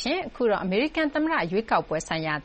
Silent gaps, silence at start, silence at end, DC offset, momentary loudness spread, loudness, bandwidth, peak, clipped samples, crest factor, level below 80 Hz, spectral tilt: none; 0 s; 0 s; under 0.1%; 4 LU; -25 LUFS; 8.4 kHz; -10 dBFS; under 0.1%; 16 dB; -52 dBFS; -5 dB/octave